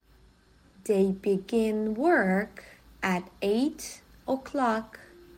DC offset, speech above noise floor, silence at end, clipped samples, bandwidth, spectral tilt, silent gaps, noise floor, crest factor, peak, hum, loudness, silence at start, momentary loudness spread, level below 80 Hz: under 0.1%; 32 dB; 0.4 s; under 0.1%; 16.5 kHz; -6 dB/octave; none; -59 dBFS; 18 dB; -12 dBFS; none; -28 LUFS; 0.85 s; 16 LU; -60 dBFS